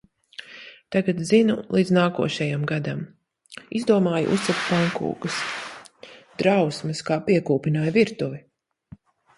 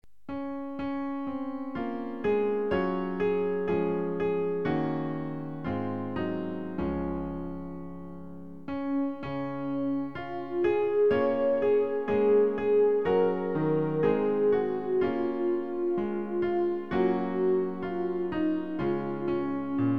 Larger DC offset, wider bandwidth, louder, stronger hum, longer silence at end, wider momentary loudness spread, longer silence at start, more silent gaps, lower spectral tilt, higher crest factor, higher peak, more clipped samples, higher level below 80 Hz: second, under 0.1% vs 0.5%; first, 11.5 kHz vs 5.4 kHz; first, -23 LUFS vs -29 LUFS; neither; first, 1 s vs 0 s; first, 20 LU vs 11 LU; about the same, 0.4 s vs 0.3 s; neither; second, -6 dB/octave vs -9.5 dB/octave; about the same, 18 dB vs 14 dB; first, -6 dBFS vs -14 dBFS; neither; second, -62 dBFS vs -54 dBFS